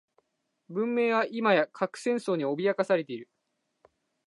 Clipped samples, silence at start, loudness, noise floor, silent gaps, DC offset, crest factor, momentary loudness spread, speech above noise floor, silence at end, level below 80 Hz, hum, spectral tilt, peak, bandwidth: under 0.1%; 0.7 s; -28 LUFS; -79 dBFS; none; under 0.1%; 18 dB; 9 LU; 52 dB; 1 s; -86 dBFS; none; -5.5 dB/octave; -10 dBFS; 11.5 kHz